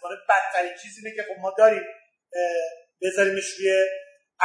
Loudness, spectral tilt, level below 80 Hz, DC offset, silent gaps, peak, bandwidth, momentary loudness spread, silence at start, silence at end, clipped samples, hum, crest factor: -23 LUFS; -2.5 dB/octave; -86 dBFS; under 0.1%; none; -4 dBFS; 10.5 kHz; 16 LU; 0 s; 0 s; under 0.1%; none; 20 dB